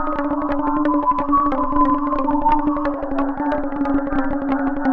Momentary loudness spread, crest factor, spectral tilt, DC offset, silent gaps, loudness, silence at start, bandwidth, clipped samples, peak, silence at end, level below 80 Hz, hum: 5 LU; 14 dB; -9 dB/octave; under 0.1%; none; -20 LUFS; 0 s; 4.9 kHz; under 0.1%; -4 dBFS; 0 s; -32 dBFS; none